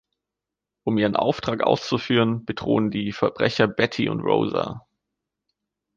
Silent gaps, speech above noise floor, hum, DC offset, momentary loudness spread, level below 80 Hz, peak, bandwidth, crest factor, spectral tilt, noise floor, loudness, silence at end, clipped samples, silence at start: none; 64 dB; none; under 0.1%; 6 LU; -56 dBFS; -4 dBFS; 7.4 kHz; 20 dB; -6.5 dB/octave; -86 dBFS; -23 LUFS; 1.2 s; under 0.1%; 0.85 s